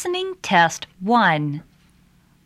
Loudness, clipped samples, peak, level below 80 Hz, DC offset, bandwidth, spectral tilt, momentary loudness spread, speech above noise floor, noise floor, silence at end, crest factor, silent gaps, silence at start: -19 LUFS; under 0.1%; -4 dBFS; -62 dBFS; under 0.1%; 14.5 kHz; -4.5 dB/octave; 12 LU; 36 dB; -56 dBFS; 0.85 s; 18 dB; none; 0 s